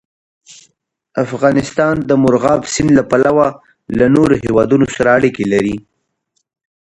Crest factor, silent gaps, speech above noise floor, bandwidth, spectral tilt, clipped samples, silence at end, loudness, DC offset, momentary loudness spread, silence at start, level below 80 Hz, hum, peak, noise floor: 14 dB; none; 55 dB; 11 kHz; -6 dB/octave; under 0.1%; 1.05 s; -13 LUFS; under 0.1%; 9 LU; 1.15 s; -42 dBFS; none; 0 dBFS; -68 dBFS